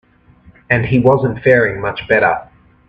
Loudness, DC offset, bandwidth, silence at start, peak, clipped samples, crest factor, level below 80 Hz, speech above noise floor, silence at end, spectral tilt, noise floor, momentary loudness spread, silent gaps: -14 LUFS; under 0.1%; 5.2 kHz; 0.7 s; 0 dBFS; under 0.1%; 16 dB; -42 dBFS; 33 dB; 0.45 s; -9 dB/octave; -47 dBFS; 6 LU; none